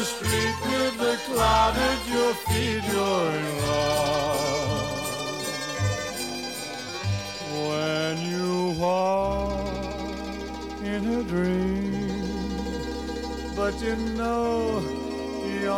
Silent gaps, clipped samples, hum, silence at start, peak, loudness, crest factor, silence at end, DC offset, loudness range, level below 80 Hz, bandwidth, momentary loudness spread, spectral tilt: none; under 0.1%; none; 0 s; -10 dBFS; -26 LUFS; 16 dB; 0 s; 0.1%; 5 LU; -40 dBFS; 17 kHz; 8 LU; -4.5 dB/octave